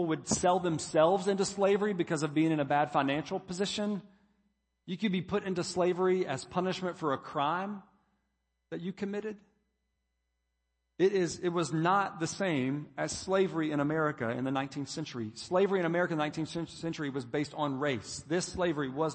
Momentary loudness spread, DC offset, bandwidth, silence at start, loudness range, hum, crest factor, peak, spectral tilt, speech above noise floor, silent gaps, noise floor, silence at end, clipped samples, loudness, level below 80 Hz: 9 LU; under 0.1%; 8.8 kHz; 0 s; 7 LU; none; 20 dB; -12 dBFS; -5 dB/octave; 50 dB; none; -81 dBFS; 0 s; under 0.1%; -32 LUFS; -66 dBFS